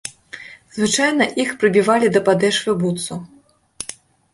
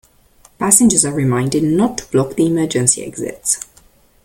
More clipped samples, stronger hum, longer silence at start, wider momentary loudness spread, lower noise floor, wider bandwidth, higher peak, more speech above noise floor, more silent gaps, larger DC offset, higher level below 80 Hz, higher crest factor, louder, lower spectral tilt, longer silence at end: neither; neither; second, 0.05 s vs 0.6 s; first, 18 LU vs 11 LU; second, -39 dBFS vs -50 dBFS; second, 12 kHz vs 17 kHz; about the same, -2 dBFS vs 0 dBFS; second, 22 dB vs 35 dB; neither; neither; second, -58 dBFS vs -46 dBFS; about the same, 16 dB vs 16 dB; about the same, -17 LUFS vs -15 LUFS; about the same, -4 dB/octave vs -4.5 dB/octave; second, 0.4 s vs 0.6 s